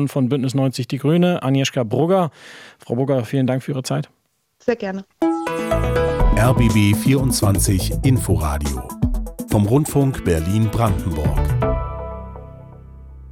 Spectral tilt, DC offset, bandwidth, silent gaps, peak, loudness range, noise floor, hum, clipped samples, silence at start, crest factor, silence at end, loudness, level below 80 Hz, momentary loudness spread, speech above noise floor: -6 dB/octave; under 0.1%; 17 kHz; none; -4 dBFS; 5 LU; -39 dBFS; none; under 0.1%; 0 s; 14 dB; 0 s; -19 LUFS; -28 dBFS; 12 LU; 21 dB